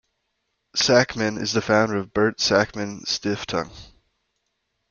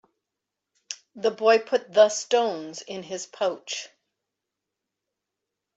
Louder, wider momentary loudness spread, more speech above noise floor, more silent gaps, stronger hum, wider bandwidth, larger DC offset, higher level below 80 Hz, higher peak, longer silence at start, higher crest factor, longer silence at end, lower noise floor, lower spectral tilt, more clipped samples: about the same, -22 LUFS vs -24 LUFS; second, 10 LU vs 18 LU; second, 53 dB vs 61 dB; neither; neither; about the same, 7.4 kHz vs 8 kHz; neither; first, -54 dBFS vs -80 dBFS; first, -2 dBFS vs -6 dBFS; second, 0.75 s vs 0.9 s; about the same, 22 dB vs 22 dB; second, 1.05 s vs 1.9 s; second, -75 dBFS vs -85 dBFS; first, -3.5 dB/octave vs -2 dB/octave; neither